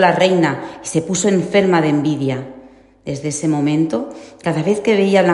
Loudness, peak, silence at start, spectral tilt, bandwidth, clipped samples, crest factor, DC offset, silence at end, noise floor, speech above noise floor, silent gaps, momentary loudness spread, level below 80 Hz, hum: -17 LUFS; 0 dBFS; 0 s; -5.5 dB/octave; 11.5 kHz; under 0.1%; 16 dB; under 0.1%; 0 s; -43 dBFS; 27 dB; none; 12 LU; -56 dBFS; none